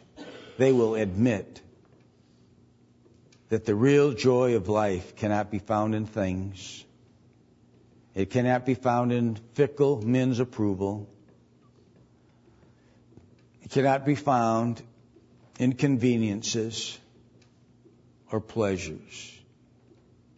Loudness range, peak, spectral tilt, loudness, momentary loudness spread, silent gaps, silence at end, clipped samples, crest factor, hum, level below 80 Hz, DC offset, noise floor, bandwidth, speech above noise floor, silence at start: 8 LU; -8 dBFS; -6.5 dB/octave; -26 LUFS; 17 LU; none; 1.05 s; under 0.1%; 20 dB; none; -62 dBFS; under 0.1%; -59 dBFS; 8 kHz; 34 dB; 0.2 s